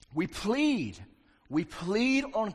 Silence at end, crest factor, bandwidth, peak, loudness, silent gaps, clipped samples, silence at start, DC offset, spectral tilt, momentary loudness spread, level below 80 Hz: 0 s; 14 dB; 13 kHz; -16 dBFS; -30 LUFS; none; under 0.1%; 0.1 s; under 0.1%; -5 dB/octave; 8 LU; -56 dBFS